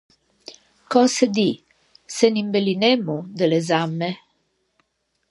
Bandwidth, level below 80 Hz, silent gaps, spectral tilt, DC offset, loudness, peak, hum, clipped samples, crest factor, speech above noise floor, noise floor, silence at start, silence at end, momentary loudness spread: 11.5 kHz; -72 dBFS; none; -5 dB/octave; under 0.1%; -20 LUFS; -2 dBFS; none; under 0.1%; 20 dB; 51 dB; -71 dBFS; 0.5 s; 1.15 s; 18 LU